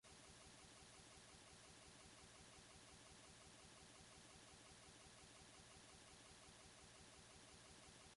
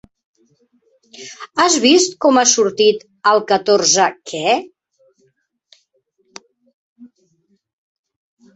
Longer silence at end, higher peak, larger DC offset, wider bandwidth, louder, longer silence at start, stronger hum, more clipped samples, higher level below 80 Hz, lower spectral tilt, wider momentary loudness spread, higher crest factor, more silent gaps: second, 0 s vs 1.5 s; second, -50 dBFS vs 0 dBFS; neither; first, 11.5 kHz vs 8.4 kHz; second, -63 LUFS vs -14 LUFS; second, 0.05 s vs 1.2 s; neither; neither; second, -78 dBFS vs -66 dBFS; about the same, -2.5 dB/octave vs -1.5 dB/octave; second, 0 LU vs 11 LU; about the same, 14 dB vs 18 dB; second, none vs 6.74-6.96 s